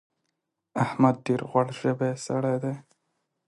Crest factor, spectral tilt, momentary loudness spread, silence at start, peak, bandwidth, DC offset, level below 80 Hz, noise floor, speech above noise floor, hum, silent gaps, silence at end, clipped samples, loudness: 20 dB; -7 dB/octave; 10 LU; 0.75 s; -6 dBFS; 11.5 kHz; under 0.1%; -70 dBFS; -81 dBFS; 55 dB; none; none; 0.65 s; under 0.1%; -27 LUFS